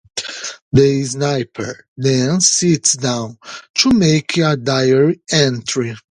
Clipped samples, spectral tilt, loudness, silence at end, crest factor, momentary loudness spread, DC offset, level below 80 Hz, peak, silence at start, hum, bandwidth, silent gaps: under 0.1%; -4 dB/octave; -15 LUFS; 0.1 s; 16 dB; 13 LU; under 0.1%; -48 dBFS; 0 dBFS; 0.15 s; none; 11 kHz; 0.62-0.71 s, 1.88-1.96 s, 3.70-3.74 s